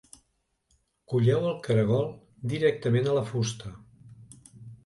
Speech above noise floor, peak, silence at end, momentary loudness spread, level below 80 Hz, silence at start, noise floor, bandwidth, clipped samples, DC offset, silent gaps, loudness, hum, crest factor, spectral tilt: 49 dB; -10 dBFS; 0.1 s; 16 LU; -60 dBFS; 1.1 s; -74 dBFS; 11.5 kHz; under 0.1%; under 0.1%; none; -27 LUFS; none; 18 dB; -6.5 dB/octave